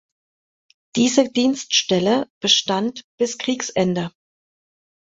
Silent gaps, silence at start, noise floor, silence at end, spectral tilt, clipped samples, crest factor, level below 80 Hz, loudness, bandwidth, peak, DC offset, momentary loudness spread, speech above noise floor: 2.30-2.41 s, 3.04-3.18 s; 0.95 s; under -90 dBFS; 1 s; -3.5 dB/octave; under 0.1%; 20 dB; -62 dBFS; -19 LUFS; 8 kHz; -2 dBFS; under 0.1%; 9 LU; over 70 dB